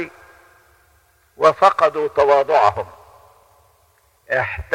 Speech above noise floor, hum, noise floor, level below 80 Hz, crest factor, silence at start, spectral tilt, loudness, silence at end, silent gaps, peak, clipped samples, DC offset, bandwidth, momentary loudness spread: 42 dB; none; -58 dBFS; -48 dBFS; 20 dB; 0 s; -4.5 dB/octave; -16 LUFS; 0 s; none; 0 dBFS; under 0.1%; under 0.1%; 13 kHz; 15 LU